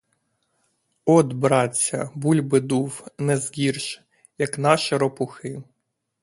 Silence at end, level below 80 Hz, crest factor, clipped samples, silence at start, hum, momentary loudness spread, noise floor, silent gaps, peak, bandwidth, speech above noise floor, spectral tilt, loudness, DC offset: 0.6 s; -64 dBFS; 22 dB; under 0.1%; 1.05 s; none; 13 LU; -71 dBFS; none; 0 dBFS; 11.5 kHz; 50 dB; -5 dB/octave; -22 LUFS; under 0.1%